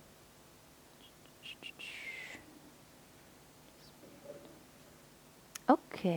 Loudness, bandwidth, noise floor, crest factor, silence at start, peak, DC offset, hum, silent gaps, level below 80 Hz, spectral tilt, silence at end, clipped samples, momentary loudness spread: -38 LUFS; over 20 kHz; -60 dBFS; 30 dB; 0 s; -12 dBFS; under 0.1%; none; none; -74 dBFS; -5.5 dB/octave; 0 s; under 0.1%; 27 LU